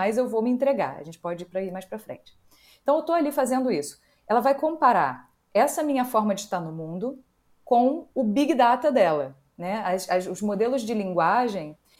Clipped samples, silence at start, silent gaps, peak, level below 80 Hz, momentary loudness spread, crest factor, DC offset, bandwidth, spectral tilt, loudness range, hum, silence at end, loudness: under 0.1%; 0 s; none; -6 dBFS; -68 dBFS; 14 LU; 18 dB; under 0.1%; 16.5 kHz; -5.5 dB/octave; 4 LU; none; 0.25 s; -24 LUFS